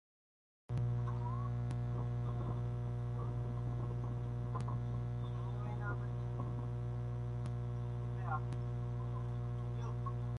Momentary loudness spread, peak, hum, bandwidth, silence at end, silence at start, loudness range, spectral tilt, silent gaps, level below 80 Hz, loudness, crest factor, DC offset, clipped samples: 2 LU; -26 dBFS; 60 Hz at -40 dBFS; 6.4 kHz; 0 s; 0.7 s; 1 LU; -9 dB/octave; none; -50 dBFS; -40 LUFS; 14 dB; under 0.1%; under 0.1%